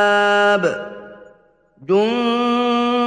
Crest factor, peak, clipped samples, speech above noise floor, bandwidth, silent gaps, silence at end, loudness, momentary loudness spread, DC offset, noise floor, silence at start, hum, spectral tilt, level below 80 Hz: 14 dB; -4 dBFS; under 0.1%; 38 dB; 10 kHz; none; 0 s; -17 LUFS; 19 LU; under 0.1%; -54 dBFS; 0 s; none; -5 dB/octave; -64 dBFS